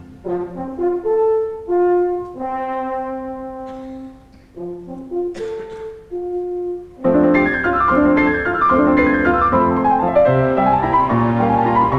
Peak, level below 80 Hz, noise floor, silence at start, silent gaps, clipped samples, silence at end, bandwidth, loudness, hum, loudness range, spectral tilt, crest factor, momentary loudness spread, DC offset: -2 dBFS; -40 dBFS; -42 dBFS; 0 s; none; under 0.1%; 0 s; 7 kHz; -17 LUFS; none; 13 LU; -9 dB/octave; 14 dB; 16 LU; under 0.1%